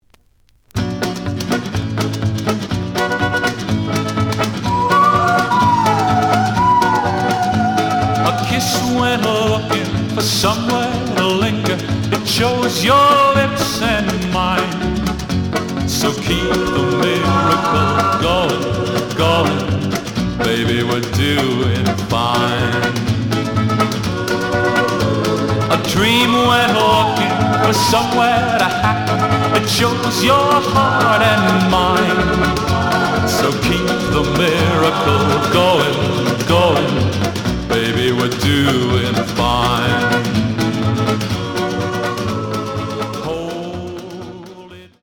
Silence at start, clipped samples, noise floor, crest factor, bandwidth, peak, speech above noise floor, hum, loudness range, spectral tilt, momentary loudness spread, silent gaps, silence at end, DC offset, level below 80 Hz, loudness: 0.75 s; under 0.1%; -54 dBFS; 14 dB; over 20 kHz; -2 dBFS; 40 dB; none; 4 LU; -5 dB/octave; 8 LU; none; 0.15 s; under 0.1%; -36 dBFS; -15 LUFS